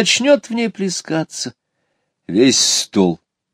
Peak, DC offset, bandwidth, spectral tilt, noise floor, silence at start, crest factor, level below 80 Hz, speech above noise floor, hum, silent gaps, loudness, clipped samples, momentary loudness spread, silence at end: 0 dBFS; under 0.1%; 16 kHz; -3 dB/octave; -70 dBFS; 0 s; 18 dB; -62 dBFS; 54 dB; none; none; -16 LUFS; under 0.1%; 14 LU; 0.4 s